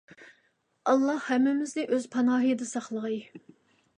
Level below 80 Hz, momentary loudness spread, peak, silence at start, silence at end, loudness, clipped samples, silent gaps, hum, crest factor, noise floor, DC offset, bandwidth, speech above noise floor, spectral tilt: -82 dBFS; 9 LU; -10 dBFS; 0.2 s; 0.6 s; -28 LUFS; under 0.1%; none; none; 18 dB; -71 dBFS; under 0.1%; 10 kHz; 44 dB; -4.5 dB/octave